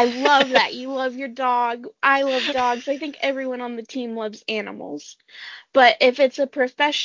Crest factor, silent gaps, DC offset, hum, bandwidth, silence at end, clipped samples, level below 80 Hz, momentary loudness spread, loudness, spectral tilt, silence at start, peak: 20 dB; none; under 0.1%; none; 7.6 kHz; 0 s; under 0.1%; -66 dBFS; 17 LU; -20 LUFS; -2.5 dB/octave; 0 s; -2 dBFS